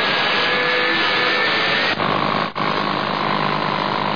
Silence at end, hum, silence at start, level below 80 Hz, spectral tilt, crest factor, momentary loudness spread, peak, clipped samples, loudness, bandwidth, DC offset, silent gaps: 0 s; none; 0 s; -60 dBFS; -5 dB/octave; 12 dB; 4 LU; -6 dBFS; under 0.1%; -18 LUFS; 5.4 kHz; 0.8%; none